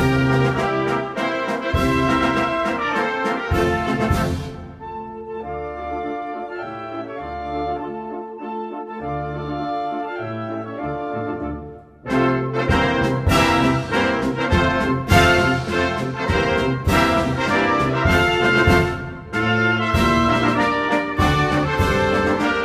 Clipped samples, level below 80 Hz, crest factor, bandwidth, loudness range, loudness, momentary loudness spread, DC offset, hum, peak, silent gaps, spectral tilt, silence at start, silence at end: under 0.1%; -34 dBFS; 18 dB; 15 kHz; 11 LU; -20 LUFS; 13 LU; under 0.1%; none; -2 dBFS; none; -6 dB/octave; 0 s; 0 s